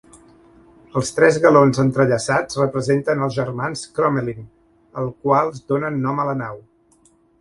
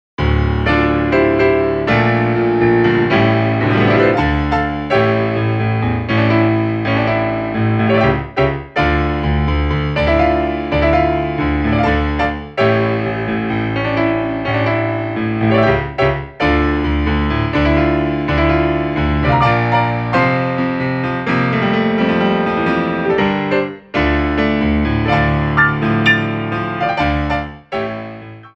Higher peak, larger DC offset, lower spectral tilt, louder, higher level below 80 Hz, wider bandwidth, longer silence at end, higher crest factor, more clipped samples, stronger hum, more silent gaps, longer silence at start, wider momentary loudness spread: about the same, 0 dBFS vs 0 dBFS; neither; second, -6 dB/octave vs -8.5 dB/octave; second, -19 LUFS vs -15 LUFS; second, -54 dBFS vs -26 dBFS; first, 11.5 kHz vs 7.2 kHz; first, 0.8 s vs 0.1 s; first, 20 dB vs 14 dB; neither; neither; neither; first, 0.95 s vs 0.2 s; first, 14 LU vs 5 LU